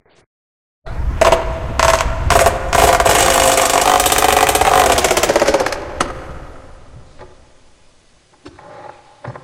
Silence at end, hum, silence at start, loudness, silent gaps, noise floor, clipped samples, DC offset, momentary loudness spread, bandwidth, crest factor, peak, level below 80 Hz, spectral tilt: 0.05 s; none; 0.85 s; -13 LUFS; none; -51 dBFS; under 0.1%; under 0.1%; 13 LU; 17.5 kHz; 16 dB; 0 dBFS; -28 dBFS; -2.5 dB/octave